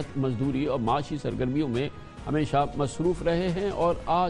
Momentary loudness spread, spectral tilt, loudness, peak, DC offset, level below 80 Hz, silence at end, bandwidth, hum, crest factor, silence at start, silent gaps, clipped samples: 5 LU; -7 dB/octave; -27 LUFS; -12 dBFS; under 0.1%; -44 dBFS; 0 s; 11 kHz; none; 14 dB; 0 s; none; under 0.1%